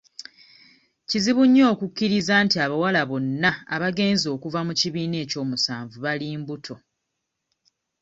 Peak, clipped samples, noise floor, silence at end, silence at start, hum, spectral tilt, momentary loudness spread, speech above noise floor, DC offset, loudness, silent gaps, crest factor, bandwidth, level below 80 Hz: -4 dBFS; under 0.1%; -80 dBFS; 1.25 s; 0.2 s; none; -4.5 dB/octave; 16 LU; 57 dB; under 0.1%; -22 LUFS; none; 18 dB; 8 kHz; -62 dBFS